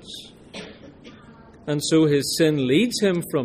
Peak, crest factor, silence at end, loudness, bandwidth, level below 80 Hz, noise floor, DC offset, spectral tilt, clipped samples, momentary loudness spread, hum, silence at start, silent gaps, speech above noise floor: -6 dBFS; 16 dB; 0 s; -20 LUFS; 15.5 kHz; -58 dBFS; -47 dBFS; under 0.1%; -5 dB/octave; under 0.1%; 20 LU; none; 0.05 s; none; 27 dB